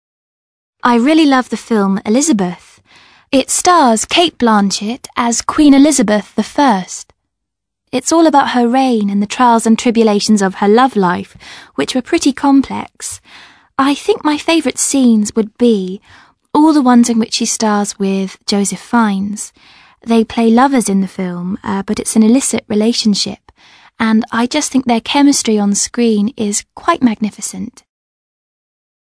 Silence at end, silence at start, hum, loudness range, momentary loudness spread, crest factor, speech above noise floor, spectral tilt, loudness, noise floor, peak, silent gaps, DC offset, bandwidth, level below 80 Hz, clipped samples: 1.4 s; 0.85 s; none; 3 LU; 12 LU; 14 dB; 65 dB; -4 dB/octave; -13 LUFS; -78 dBFS; 0 dBFS; none; under 0.1%; 11 kHz; -50 dBFS; under 0.1%